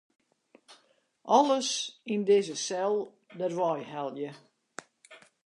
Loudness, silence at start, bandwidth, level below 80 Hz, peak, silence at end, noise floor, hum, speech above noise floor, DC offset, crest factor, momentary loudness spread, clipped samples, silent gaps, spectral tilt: -29 LUFS; 0.7 s; 11 kHz; -88 dBFS; -10 dBFS; 0.3 s; -67 dBFS; none; 39 dB; under 0.1%; 22 dB; 23 LU; under 0.1%; none; -3.5 dB/octave